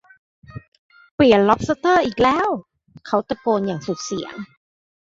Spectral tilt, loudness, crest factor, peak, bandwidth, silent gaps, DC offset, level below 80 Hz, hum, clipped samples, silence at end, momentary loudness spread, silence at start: -5.5 dB/octave; -19 LUFS; 18 dB; -2 dBFS; 7.8 kHz; 0.68-0.72 s, 0.79-0.89 s, 1.11-1.18 s; under 0.1%; -48 dBFS; none; under 0.1%; 0.6 s; 22 LU; 0.55 s